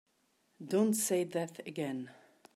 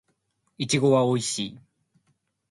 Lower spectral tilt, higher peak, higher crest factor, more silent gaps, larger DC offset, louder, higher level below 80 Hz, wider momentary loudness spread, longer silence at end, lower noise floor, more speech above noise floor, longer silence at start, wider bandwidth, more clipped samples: about the same, -4.5 dB/octave vs -4.5 dB/octave; second, -20 dBFS vs -8 dBFS; about the same, 16 dB vs 18 dB; neither; neither; second, -34 LUFS vs -24 LUFS; second, -86 dBFS vs -66 dBFS; first, 16 LU vs 13 LU; second, 0.45 s vs 0.95 s; about the same, -75 dBFS vs -73 dBFS; second, 41 dB vs 49 dB; about the same, 0.6 s vs 0.6 s; first, 16 kHz vs 11.5 kHz; neither